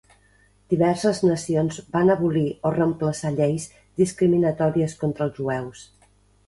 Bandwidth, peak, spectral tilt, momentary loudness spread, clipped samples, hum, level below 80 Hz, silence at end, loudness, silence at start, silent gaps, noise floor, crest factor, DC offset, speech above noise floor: 11.5 kHz; -6 dBFS; -7 dB/octave; 8 LU; under 0.1%; 50 Hz at -50 dBFS; -54 dBFS; 0.65 s; -23 LUFS; 0.7 s; none; -58 dBFS; 16 dB; under 0.1%; 37 dB